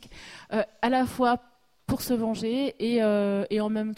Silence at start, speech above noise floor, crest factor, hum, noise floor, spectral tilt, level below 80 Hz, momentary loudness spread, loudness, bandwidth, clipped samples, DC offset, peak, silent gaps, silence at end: 0 s; 21 dB; 16 dB; none; -46 dBFS; -5.5 dB/octave; -54 dBFS; 8 LU; -27 LUFS; 16 kHz; under 0.1%; under 0.1%; -10 dBFS; none; 0 s